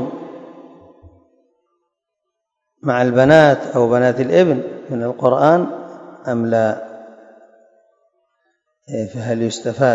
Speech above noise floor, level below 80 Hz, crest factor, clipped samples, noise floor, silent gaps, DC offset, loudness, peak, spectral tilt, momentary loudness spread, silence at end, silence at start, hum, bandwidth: 63 dB; -56 dBFS; 18 dB; under 0.1%; -78 dBFS; none; under 0.1%; -16 LUFS; 0 dBFS; -6.5 dB/octave; 22 LU; 0 s; 0 s; none; 8 kHz